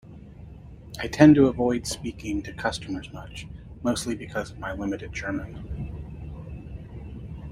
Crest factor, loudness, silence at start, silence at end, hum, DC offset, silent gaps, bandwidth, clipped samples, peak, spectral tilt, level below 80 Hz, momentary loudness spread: 24 dB; -25 LUFS; 0.05 s; 0 s; none; under 0.1%; none; 15 kHz; under 0.1%; -2 dBFS; -6 dB/octave; -44 dBFS; 23 LU